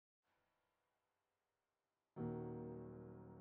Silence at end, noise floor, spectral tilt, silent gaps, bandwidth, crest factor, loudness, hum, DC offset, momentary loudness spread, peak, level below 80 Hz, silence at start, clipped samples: 0 s; under -90 dBFS; -8.5 dB/octave; none; 3.4 kHz; 18 dB; -51 LUFS; none; under 0.1%; 10 LU; -36 dBFS; -76 dBFS; 2.15 s; under 0.1%